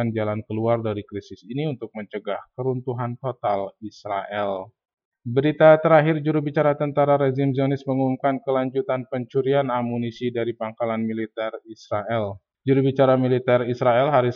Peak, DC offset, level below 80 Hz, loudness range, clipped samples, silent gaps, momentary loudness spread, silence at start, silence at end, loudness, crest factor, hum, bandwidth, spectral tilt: -2 dBFS; under 0.1%; -68 dBFS; 9 LU; under 0.1%; 4.94-4.98 s, 5.05-5.12 s; 13 LU; 0 s; 0 s; -22 LUFS; 20 dB; none; 6.8 kHz; -9 dB/octave